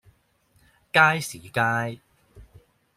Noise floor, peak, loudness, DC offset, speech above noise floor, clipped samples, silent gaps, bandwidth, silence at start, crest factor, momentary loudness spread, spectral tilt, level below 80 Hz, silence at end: -64 dBFS; -4 dBFS; -22 LUFS; under 0.1%; 42 dB; under 0.1%; none; 16 kHz; 0.95 s; 24 dB; 14 LU; -4 dB/octave; -60 dBFS; 0.55 s